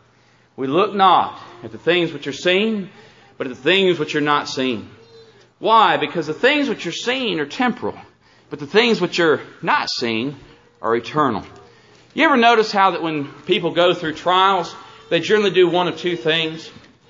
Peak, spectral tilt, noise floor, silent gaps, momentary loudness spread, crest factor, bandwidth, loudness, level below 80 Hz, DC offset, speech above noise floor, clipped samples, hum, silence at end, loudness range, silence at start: -2 dBFS; -4.5 dB/octave; -55 dBFS; none; 15 LU; 18 dB; 7.6 kHz; -18 LUFS; -64 dBFS; under 0.1%; 37 dB; under 0.1%; none; 0.4 s; 3 LU; 0.6 s